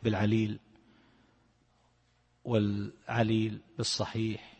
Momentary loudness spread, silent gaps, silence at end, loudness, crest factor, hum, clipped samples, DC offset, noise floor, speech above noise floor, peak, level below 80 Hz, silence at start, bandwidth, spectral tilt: 8 LU; none; 0.1 s; -31 LUFS; 20 dB; none; under 0.1%; under 0.1%; -70 dBFS; 39 dB; -14 dBFS; -62 dBFS; 0 s; 8.8 kHz; -5.5 dB/octave